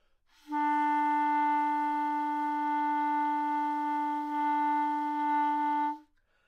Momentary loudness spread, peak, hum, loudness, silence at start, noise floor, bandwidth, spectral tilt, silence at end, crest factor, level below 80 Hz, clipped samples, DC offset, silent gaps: 4 LU; -20 dBFS; none; -30 LUFS; 0.45 s; -61 dBFS; 7 kHz; -3 dB/octave; 0.45 s; 10 dB; -74 dBFS; under 0.1%; under 0.1%; none